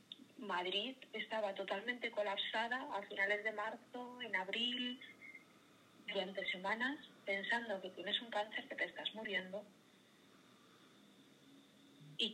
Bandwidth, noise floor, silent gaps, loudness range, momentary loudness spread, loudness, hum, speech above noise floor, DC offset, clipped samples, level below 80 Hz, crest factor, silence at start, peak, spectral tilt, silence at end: 15.5 kHz; -67 dBFS; none; 6 LU; 13 LU; -41 LUFS; none; 25 dB; under 0.1%; under 0.1%; under -90 dBFS; 20 dB; 0.1 s; -24 dBFS; -3.5 dB/octave; 0 s